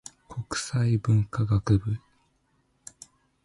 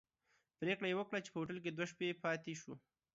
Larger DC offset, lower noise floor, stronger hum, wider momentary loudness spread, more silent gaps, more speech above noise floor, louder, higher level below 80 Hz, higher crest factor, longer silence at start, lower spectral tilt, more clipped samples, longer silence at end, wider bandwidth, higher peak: neither; second, -69 dBFS vs -81 dBFS; neither; first, 22 LU vs 11 LU; neither; first, 45 dB vs 39 dB; first, -26 LUFS vs -42 LUFS; first, -46 dBFS vs -82 dBFS; about the same, 18 dB vs 20 dB; second, 0.3 s vs 0.6 s; first, -6 dB/octave vs -4 dB/octave; neither; first, 1.45 s vs 0.35 s; first, 11.5 kHz vs 7.6 kHz; first, -10 dBFS vs -24 dBFS